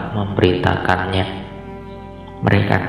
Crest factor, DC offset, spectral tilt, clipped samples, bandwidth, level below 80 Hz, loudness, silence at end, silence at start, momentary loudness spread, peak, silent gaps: 18 dB; under 0.1%; -7.5 dB/octave; under 0.1%; 10.5 kHz; -42 dBFS; -18 LUFS; 0 s; 0 s; 18 LU; 0 dBFS; none